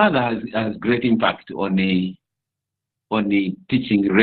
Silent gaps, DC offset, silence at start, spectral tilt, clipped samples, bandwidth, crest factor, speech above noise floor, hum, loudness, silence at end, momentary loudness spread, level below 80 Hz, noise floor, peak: none; under 0.1%; 0 s; -11 dB/octave; under 0.1%; 4.6 kHz; 18 dB; 65 dB; none; -21 LUFS; 0 s; 7 LU; -56 dBFS; -84 dBFS; -2 dBFS